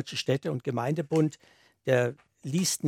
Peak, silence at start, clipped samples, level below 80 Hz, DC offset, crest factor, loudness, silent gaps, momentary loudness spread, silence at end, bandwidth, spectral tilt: -10 dBFS; 0 s; under 0.1%; -74 dBFS; under 0.1%; 20 dB; -29 LUFS; none; 6 LU; 0 s; 16.5 kHz; -5 dB/octave